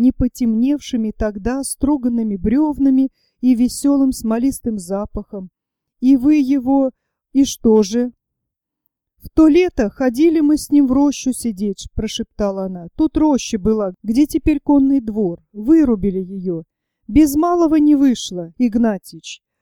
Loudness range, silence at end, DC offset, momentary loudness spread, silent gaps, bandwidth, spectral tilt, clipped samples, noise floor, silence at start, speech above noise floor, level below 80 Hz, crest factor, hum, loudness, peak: 2 LU; 0.25 s; under 0.1%; 11 LU; none; 16.5 kHz; -5.5 dB/octave; under 0.1%; -80 dBFS; 0 s; 64 dB; -36 dBFS; 14 dB; none; -17 LUFS; -2 dBFS